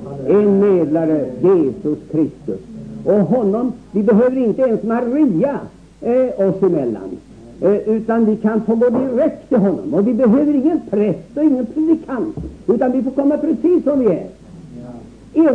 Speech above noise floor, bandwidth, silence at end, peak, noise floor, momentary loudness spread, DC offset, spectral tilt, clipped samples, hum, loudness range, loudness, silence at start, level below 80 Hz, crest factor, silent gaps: 20 dB; 8 kHz; 0 s; -4 dBFS; -35 dBFS; 12 LU; 0.1%; -10 dB/octave; under 0.1%; none; 2 LU; -16 LUFS; 0 s; -48 dBFS; 12 dB; none